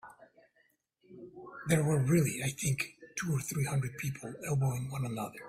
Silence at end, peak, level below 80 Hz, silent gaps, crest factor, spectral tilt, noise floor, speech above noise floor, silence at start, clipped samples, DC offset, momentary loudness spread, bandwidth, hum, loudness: 0 s; -14 dBFS; -62 dBFS; none; 20 dB; -5.5 dB/octave; -73 dBFS; 40 dB; 0.05 s; under 0.1%; under 0.1%; 16 LU; 16 kHz; none; -33 LUFS